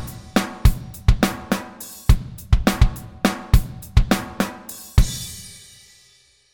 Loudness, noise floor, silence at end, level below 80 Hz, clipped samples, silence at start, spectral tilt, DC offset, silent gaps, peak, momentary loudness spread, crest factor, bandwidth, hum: -22 LUFS; -56 dBFS; 1.05 s; -22 dBFS; under 0.1%; 0 s; -5.5 dB/octave; under 0.1%; none; 0 dBFS; 12 LU; 20 dB; 17.5 kHz; none